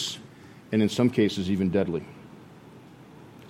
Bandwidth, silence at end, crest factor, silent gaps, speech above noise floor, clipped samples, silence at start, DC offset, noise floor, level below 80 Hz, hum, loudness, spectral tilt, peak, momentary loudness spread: 15.5 kHz; 0 s; 18 dB; none; 24 dB; under 0.1%; 0 s; under 0.1%; -48 dBFS; -60 dBFS; none; -26 LUFS; -6 dB/octave; -10 dBFS; 24 LU